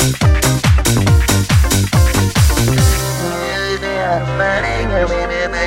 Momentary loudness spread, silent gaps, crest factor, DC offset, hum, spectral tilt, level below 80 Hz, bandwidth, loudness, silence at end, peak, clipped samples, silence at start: 6 LU; none; 12 dB; under 0.1%; none; -4.5 dB/octave; -20 dBFS; 17 kHz; -14 LUFS; 0 s; 0 dBFS; under 0.1%; 0 s